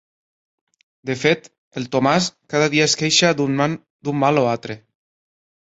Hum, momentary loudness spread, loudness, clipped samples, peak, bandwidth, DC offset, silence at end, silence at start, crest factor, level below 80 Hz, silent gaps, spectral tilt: none; 16 LU; -19 LUFS; under 0.1%; -2 dBFS; 8 kHz; under 0.1%; 0.9 s; 1.05 s; 18 dB; -60 dBFS; 1.58-1.71 s, 3.90-3.99 s; -4 dB/octave